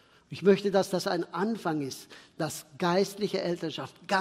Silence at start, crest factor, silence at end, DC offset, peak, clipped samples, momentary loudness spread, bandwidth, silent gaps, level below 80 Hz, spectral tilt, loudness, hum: 0.3 s; 20 dB; 0 s; under 0.1%; -10 dBFS; under 0.1%; 13 LU; 16 kHz; none; -72 dBFS; -5 dB/octave; -29 LUFS; none